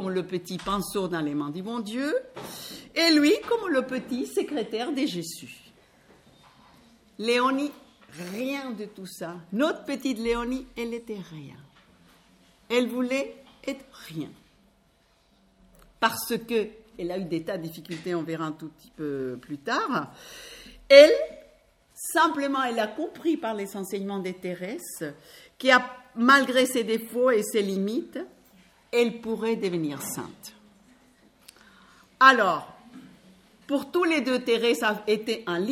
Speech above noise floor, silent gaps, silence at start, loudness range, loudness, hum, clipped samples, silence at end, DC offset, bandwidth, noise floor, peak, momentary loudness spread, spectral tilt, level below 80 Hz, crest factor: 38 dB; none; 0 s; 11 LU; -25 LUFS; none; under 0.1%; 0 s; under 0.1%; 16.5 kHz; -64 dBFS; 0 dBFS; 19 LU; -4 dB/octave; -60 dBFS; 26 dB